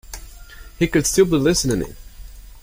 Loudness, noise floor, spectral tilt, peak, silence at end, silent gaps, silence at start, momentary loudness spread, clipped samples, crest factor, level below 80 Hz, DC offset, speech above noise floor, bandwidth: -18 LUFS; -39 dBFS; -4.5 dB/octave; -2 dBFS; 0.05 s; none; 0.05 s; 19 LU; under 0.1%; 18 dB; -36 dBFS; under 0.1%; 22 dB; 16.5 kHz